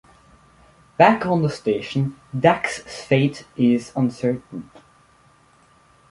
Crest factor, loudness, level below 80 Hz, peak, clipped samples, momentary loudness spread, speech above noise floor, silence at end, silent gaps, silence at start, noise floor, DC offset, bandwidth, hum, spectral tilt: 20 dB; -21 LUFS; -58 dBFS; -2 dBFS; under 0.1%; 14 LU; 35 dB; 1.45 s; none; 1 s; -55 dBFS; under 0.1%; 11.5 kHz; none; -6.5 dB/octave